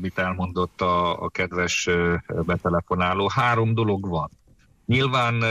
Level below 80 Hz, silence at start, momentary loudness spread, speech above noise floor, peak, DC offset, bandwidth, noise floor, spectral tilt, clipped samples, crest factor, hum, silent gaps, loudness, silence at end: -46 dBFS; 0 s; 6 LU; 32 dB; -10 dBFS; under 0.1%; 12 kHz; -55 dBFS; -5.5 dB/octave; under 0.1%; 12 dB; none; none; -23 LUFS; 0 s